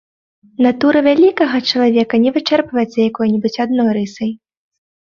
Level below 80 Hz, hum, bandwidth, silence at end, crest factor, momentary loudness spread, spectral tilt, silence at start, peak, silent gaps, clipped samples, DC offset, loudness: -58 dBFS; none; 7.2 kHz; 0.75 s; 14 dB; 10 LU; -6 dB/octave; 0.6 s; 0 dBFS; none; under 0.1%; under 0.1%; -14 LUFS